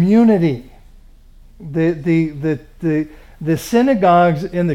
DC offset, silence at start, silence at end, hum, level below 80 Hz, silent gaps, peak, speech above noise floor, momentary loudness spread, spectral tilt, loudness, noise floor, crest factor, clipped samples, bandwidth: under 0.1%; 0 s; 0 s; none; -42 dBFS; none; -2 dBFS; 28 dB; 14 LU; -7.5 dB/octave; -16 LUFS; -43 dBFS; 14 dB; under 0.1%; 15.5 kHz